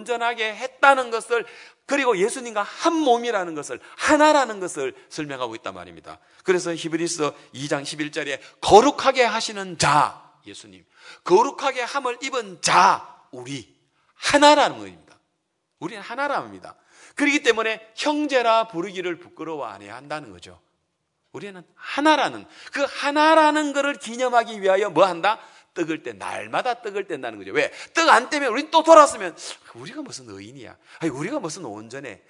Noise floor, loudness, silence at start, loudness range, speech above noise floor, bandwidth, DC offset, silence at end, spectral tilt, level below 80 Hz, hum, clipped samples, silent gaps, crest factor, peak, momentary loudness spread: -74 dBFS; -21 LUFS; 0 s; 8 LU; 53 dB; 12 kHz; under 0.1%; 0.15 s; -3 dB/octave; -62 dBFS; none; under 0.1%; none; 22 dB; 0 dBFS; 20 LU